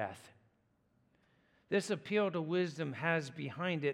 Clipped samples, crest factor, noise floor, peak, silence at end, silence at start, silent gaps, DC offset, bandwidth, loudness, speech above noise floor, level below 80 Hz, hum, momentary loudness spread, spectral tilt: under 0.1%; 20 dB; -75 dBFS; -18 dBFS; 0 s; 0 s; none; under 0.1%; 13 kHz; -36 LUFS; 39 dB; -84 dBFS; none; 8 LU; -5.5 dB/octave